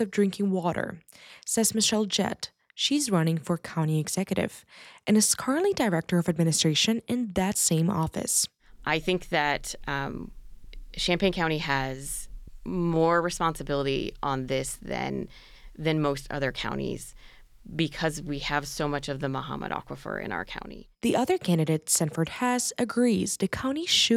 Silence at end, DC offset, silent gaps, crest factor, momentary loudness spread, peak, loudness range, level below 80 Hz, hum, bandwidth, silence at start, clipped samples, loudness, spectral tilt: 0 s; under 0.1%; none; 18 dB; 13 LU; -10 dBFS; 6 LU; -48 dBFS; none; 16.5 kHz; 0 s; under 0.1%; -27 LUFS; -4 dB/octave